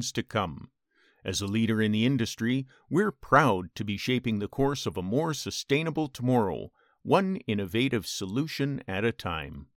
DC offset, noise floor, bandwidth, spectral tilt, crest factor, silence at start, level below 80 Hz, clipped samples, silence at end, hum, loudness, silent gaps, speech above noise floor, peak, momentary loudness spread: under 0.1%; -66 dBFS; 17.5 kHz; -5.5 dB/octave; 22 dB; 0 s; -56 dBFS; under 0.1%; 0.15 s; none; -28 LUFS; none; 38 dB; -6 dBFS; 9 LU